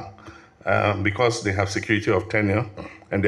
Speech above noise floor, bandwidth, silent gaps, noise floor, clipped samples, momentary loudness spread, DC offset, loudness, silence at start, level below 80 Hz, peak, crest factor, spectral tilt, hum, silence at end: 23 dB; 11.5 kHz; none; -45 dBFS; under 0.1%; 12 LU; under 0.1%; -23 LUFS; 0 s; -56 dBFS; -6 dBFS; 18 dB; -5.5 dB/octave; none; 0 s